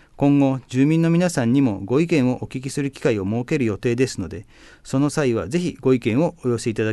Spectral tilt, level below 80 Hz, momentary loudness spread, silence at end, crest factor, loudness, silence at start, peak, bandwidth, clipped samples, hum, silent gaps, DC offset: -7 dB/octave; -48 dBFS; 8 LU; 0 s; 14 dB; -21 LUFS; 0.2 s; -6 dBFS; 12.5 kHz; under 0.1%; none; none; under 0.1%